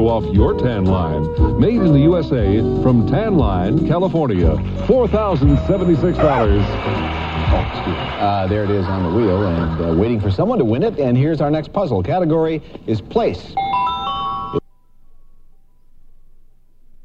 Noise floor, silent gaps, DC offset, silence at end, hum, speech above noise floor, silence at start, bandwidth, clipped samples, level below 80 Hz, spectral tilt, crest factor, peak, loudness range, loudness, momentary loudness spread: -44 dBFS; none; under 0.1%; 1.9 s; none; 28 dB; 0 s; 7.4 kHz; under 0.1%; -28 dBFS; -9.5 dB/octave; 14 dB; -2 dBFS; 7 LU; -17 LUFS; 7 LU